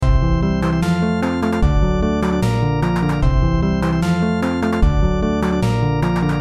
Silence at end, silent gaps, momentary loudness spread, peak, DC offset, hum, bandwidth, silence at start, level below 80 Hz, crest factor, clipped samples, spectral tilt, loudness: 0 s; none; 1 LU; -4 dBFS; under 0.1%; none; 13 kHz; 0 s; -22 dBFS; 12 dB; under 0.1%; -7.5 dB/octave; -18 LUFS